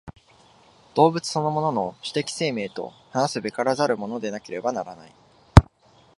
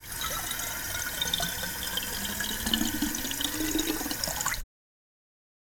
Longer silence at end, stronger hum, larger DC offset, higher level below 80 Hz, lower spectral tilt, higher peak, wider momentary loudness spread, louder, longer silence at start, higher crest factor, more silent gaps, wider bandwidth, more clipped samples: second, 0.55 s vs 1 s; neither; neither; first, -34 dBFS vs -46 dBFS; first, -6 dB/octave vs -1.5 dB/octave; first, 0 dBFS vs -10 dBFS; first, 14 LU vs 4 LU; first, -23 LUFS vs -29 LUFS; about the same, 0.05 s vs 0 s; about the same, 24 dB vs 24 dB; neither; second, 11.5 kHz vs over 20 kHz; neither